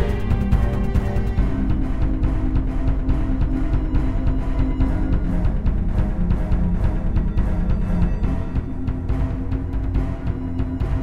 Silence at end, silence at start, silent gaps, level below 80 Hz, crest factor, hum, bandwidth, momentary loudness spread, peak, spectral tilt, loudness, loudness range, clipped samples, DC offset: 0 s; 0 s; none; -22 dBFS; 16 dB; none; 5.2 kHz; 4 LU; -4 dBFS; -9.5 dB/octave; -23 LUFS; 2 LU; under 0.1%; 3%